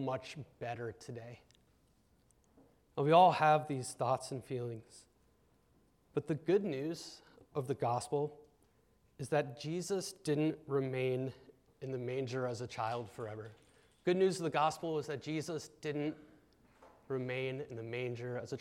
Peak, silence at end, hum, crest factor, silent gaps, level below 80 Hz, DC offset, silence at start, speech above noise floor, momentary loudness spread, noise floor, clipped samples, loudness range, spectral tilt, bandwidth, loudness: -14 dBFS; 0 s; none; 22 dB; none; -76 dBFS; under 0.1%; 0 s; 35 dB; 14 LU; -71 dBFS; under 0.1%; 7 LU; -6 dB/octave; 15.5 kHz; -36 LUFS